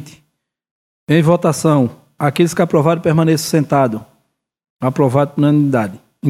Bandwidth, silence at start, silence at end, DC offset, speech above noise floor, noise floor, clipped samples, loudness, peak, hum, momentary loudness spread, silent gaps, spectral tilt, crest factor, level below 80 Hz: 15 kHz; 0 s; 0 s; under 0.1%; 53 dB; -66 dBFS; under 0.1%; -15 LUFS; 0 dBFS; none; 7 LU; 0.71-1.07 s, 4.70-4.76 s; -6.5 dB/octave; 16 dB; -56 dBFS